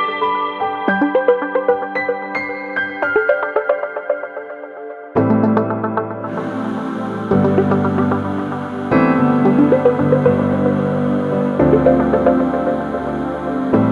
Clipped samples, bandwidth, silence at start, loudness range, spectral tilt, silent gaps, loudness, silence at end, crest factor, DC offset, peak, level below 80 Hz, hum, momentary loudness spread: under 0.1%; 6.8 kHz; 0 s; 5 LU; -9 dB/octave; none; -17 LUFS; 0 s; 16 dB; under 0.1%; 0 dBFS; -44 dBFS; none; 10 LU